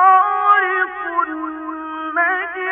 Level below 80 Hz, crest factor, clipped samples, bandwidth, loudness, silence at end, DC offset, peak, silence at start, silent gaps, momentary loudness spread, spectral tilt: -60 dBFS; 16 dB; under 0.1%; 3.9 kHz; -17 LUFS; 0 s; under 0.1%; -2 dBFS; 0 s; none; 13 LU; -5.5 dB/octave